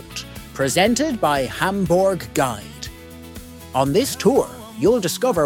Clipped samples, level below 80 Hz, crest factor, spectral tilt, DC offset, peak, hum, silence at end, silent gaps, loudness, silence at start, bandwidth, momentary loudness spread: under 0.1%; -44 dBFS; 18 dB; -4.5 dB/octave; under 0.1%; -4 dBFS; none; 0 s; none; -19 LUFS; 0 s; 18.5 kHz; 17 LU